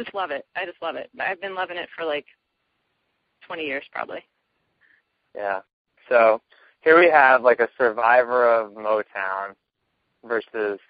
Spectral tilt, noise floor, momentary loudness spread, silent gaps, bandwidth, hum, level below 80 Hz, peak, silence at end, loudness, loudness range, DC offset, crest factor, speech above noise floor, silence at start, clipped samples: -1 dB/octave; -75 dBFS; 17 LU; 5.73-5.85 s; 5 kHz; none; -70 dBFS; -2 dBFS; 0.15 s; -21 LUFS; 16 LU; under 0.1%; 22 dB; 54 dB; 0 s; under 0.1%